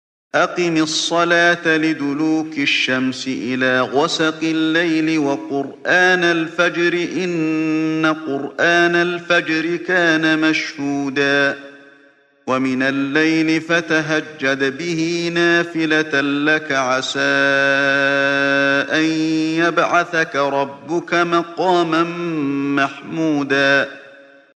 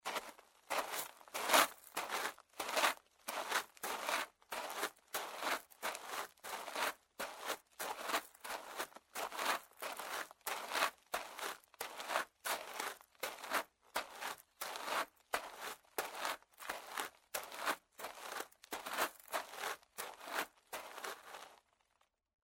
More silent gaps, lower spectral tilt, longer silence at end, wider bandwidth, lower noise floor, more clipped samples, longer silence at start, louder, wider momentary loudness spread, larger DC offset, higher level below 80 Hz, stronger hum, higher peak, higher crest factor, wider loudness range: neither; first, -4.5 dB/octave vs 0.5 dB/octave; second, 0.45 s vs 0.9 s; second, 9.4 kHz vs 16.5 kHz; second, -52 dBFS vs -80 dBFS; neither; first, 0.35 s vs 0.05 s; first, -17 LUFS vs -41 LUFS; second, 7 LU vs 10 LU; neither; first, -64 dBFS vs -82 dBFS; neither; first, -2 dBFS vs -14 dBFS; second, 16 dB vs 30 dB; second, 3 LU vs 7 LU